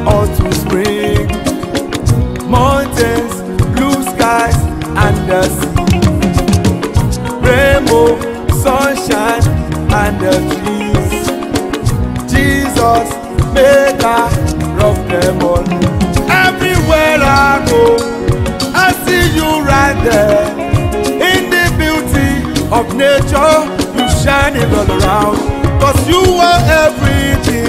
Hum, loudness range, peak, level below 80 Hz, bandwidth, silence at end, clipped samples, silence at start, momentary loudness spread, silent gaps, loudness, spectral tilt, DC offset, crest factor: none; 3 LU; 0 dBFS; -22 dBFS; 16.5 kHz; 0 s; under 0.1%; 0 s; 7 LU; none; -11 LUFS; -5.5 dB/octave; under 0.1%; 10 dB